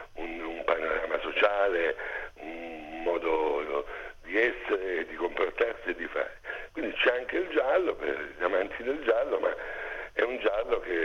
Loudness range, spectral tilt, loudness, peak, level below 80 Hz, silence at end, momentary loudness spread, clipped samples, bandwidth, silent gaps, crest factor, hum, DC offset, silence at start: 2 LU; -4.5 dB/octave; -30 LUFS; -8 dBFS; -54 dBFS; 0 s; 11 LU; under 0.1%; 7 kHz; none; 22 dB; none; under 0.1%; 0 s